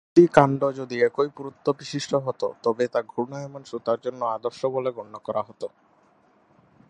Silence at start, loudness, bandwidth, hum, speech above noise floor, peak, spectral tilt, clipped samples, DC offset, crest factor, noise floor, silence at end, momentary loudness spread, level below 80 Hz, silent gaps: 0.15 s; -25 LUFS; 11 kHz; none; 36 dB; 0 dBFS; -6.5 dB/octave; under 0.1%; under 0.1%; 24 dB; -60 dBFS; 1.25 s; 15 LU; -64 dBFS; none